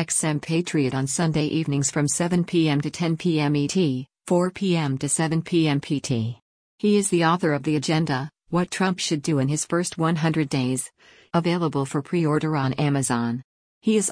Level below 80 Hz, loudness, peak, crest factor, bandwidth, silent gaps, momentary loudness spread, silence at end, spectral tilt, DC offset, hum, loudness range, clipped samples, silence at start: -58 dBFS; -23 LUFS; -10 dBFS; 14 dB; 10.5 kHz; 6.42-6.78 s, 13.44-13.81 s; 5 LU; 0 s; -5 dB/octave; under 0.1%; none; 1 LU; under 0.1%; 0 s